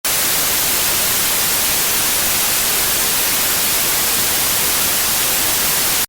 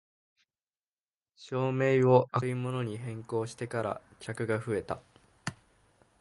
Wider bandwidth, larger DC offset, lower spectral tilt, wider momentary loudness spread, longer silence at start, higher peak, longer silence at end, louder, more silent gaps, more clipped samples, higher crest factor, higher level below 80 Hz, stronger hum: first, over 20 kHz vs 11.5 kHz; neither; second, 0 dB/octave vs -7 dB/octave; second, 0 LU vs 17 LU; second, 0.05 s vs 1.4 s; first, -4 dBFS vs -8 dBFS; second, 0.05 s vs 0.7 s; first, -13 LUFS vs -31 LUFS; neither; neither; second, 12 dB vs 24 dB; first, -42 dBFS vs -66 dBFS; neither